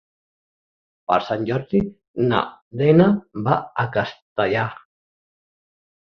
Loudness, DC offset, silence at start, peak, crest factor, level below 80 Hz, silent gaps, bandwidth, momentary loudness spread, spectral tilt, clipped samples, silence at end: -21 LUFS; under 0.1%; 1.1 s; -2 dBFS; 20 dB; -54 dBFS; 2.08-2.14 s, 2.62-2.71 s, 4.22-4.36 s; 6.4 kHz; 12 LU; -9 dB/octave; under 0.1%; 1.4 s